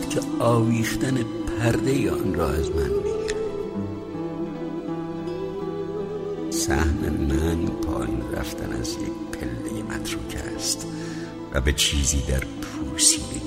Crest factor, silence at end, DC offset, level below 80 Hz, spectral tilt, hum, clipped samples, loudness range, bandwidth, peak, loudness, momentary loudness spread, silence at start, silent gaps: 20 dB; 0 s; under 0.1%; -34 dBFS; -4 dB/octave; none; under 0.1%; 6 LU; 16 kHz; -4 dBFS; -25 LUFS; 11 LU; 0 s; none